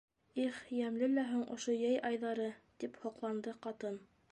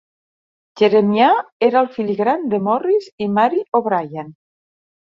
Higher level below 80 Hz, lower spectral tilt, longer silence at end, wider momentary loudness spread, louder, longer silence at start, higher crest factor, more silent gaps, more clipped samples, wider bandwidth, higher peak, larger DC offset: second, -82 dBFS vs -64 dBFS; second, -4.5 dB/octave vs -7.5 dB/octave; second, 0.3 s vs 0.75 s; first, 11 LU vs 8 LU; second, -39 LUFS vs -17 LUFS; second, 0.35 s vs 0.75 s; about the same, 14 dB vs 16 dB; second, none vs 1.52-1.60 s, 3.12-3.18 s, 3.68-3.72 s; neither; first, 10 kHz vs 7.2 kHz; second, -24 dBFS vs -2 dBFS; neither